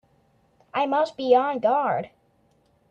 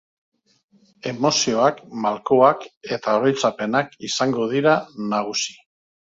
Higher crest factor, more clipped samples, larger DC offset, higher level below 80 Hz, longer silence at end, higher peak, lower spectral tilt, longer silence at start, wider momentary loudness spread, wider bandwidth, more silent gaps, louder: about the same, 18 dB vs 20 dB; neither; neither; about the same, -70 dBFS vs -66 dBFS; first, 0.85 s vs 0.6 s; second, -6 dBFS vs 0 dBFS; first, -6 dB/octave vs -4 dB/octave; second, 0.75 s vs 1.05 s; about the same, 10 LU vs 11 LU; about the same, 8 kHz vs 7.8 kHz; second, none vs 2.77-2.81 s; about the same, -23 LUFS vs -21 LUFS